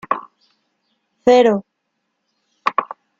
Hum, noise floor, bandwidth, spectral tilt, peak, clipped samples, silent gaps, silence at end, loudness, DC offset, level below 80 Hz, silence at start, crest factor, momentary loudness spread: none; -73 dBFS; 7.6 kHz; -5.5 dB/octave; -2 dBFS; under 0.1%; none; 0.35 s; -17 LUFS; under 0.1%; -60 dBFS; 0.1 s; 18 dB; 12 LU